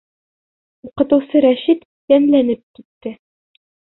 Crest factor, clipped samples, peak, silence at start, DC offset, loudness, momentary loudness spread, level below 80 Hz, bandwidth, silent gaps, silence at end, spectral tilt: 16 dB; under 0.1%; -2 dBFS; 0.85 s; under 0.1%; -15 LUFS; 19 LU; -58 dBFS; 4.1 kHz; 1.85-2.08 s, 2.63-2.74 s, 2.85-3.01 s; 0.85 s; -10.5 dB/octave